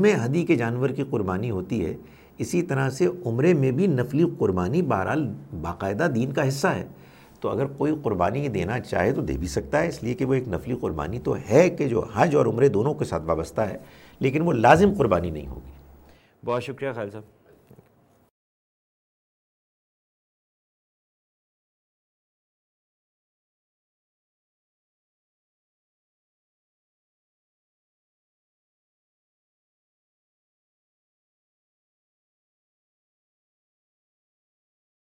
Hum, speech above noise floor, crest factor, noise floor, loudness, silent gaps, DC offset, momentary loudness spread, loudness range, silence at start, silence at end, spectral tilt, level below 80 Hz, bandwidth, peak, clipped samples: none; 37 dB; 24 dB; -60 dBFS; -24 LUFS; none; under 0.1%; 12 LU; 12 LU; 0 s; 17.95 s; -7 dB/octave; -50 dBFS; 16.5 kHz; -2 dBFS; under 0.1%